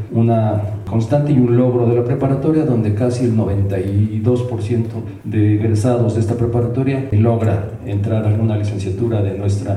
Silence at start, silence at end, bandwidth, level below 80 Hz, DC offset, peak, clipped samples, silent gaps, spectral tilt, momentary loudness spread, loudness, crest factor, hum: 0 s; 0 s; 10.5 kHz; -42 dBFS; under 0.1%; -4 dBFS; under 0.1%; none; -9 dB/octave; 6 LU; -17 LUFS; 12 dB; none